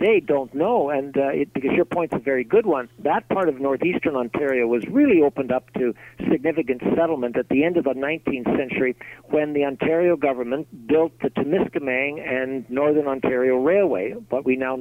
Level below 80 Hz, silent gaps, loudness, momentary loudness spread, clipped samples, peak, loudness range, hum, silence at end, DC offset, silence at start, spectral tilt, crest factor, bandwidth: -56 dBFS; none; -22 LUFS; 7 LU; under 0.1%; -6 dBFS; 2 LU; none; 0 s; under 0.1%; 0 s; -8 dB/octave; 14 dB; 16 kHz